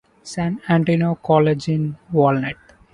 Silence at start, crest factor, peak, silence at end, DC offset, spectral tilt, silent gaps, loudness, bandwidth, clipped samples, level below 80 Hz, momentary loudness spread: 0.25 s; 16 dB; -2 dBFS; 0.4 s; under 0.1%; -7.5 dB/octave; none; -19 LUFS; 11 kHz; under 0.1%; -54 dBFS; 11 LU